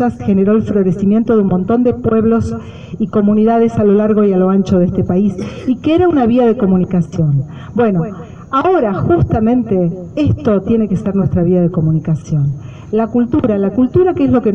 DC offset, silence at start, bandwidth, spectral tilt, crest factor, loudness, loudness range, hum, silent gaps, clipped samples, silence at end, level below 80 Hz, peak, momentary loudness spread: under 0.1%; 0 s; 7.6 kHz; -9.5 dB/octave; 12 dB; -13 LUFS; 2 LU; none; none; under 0.1%; 0 s; -36 dBFS; 0 dBFS; 7 LU